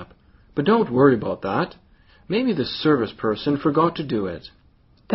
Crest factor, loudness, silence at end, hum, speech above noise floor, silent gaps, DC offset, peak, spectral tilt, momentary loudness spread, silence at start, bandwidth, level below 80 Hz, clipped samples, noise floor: 20 dB; -21 LUFS; 0 s; none; 35 dB; none; under 0.1%; -2 dBFS; -5 dB/octave; 10 LU; 0 s; 5.8 kHz; -54 dBFS; under 0.1%; -56 dBFS